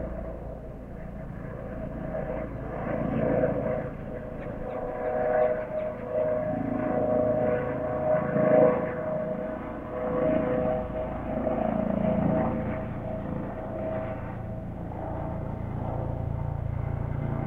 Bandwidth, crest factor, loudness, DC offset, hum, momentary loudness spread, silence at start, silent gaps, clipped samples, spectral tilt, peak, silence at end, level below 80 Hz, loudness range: 3.9 kHz; 20 dB; -29 LUFS; under 0.1%; none; 12 LU; 0 s; none; under 0.1%; -10.5 dB/octave; -8 dBFS; 0 s; -44 dBFS; 8 LU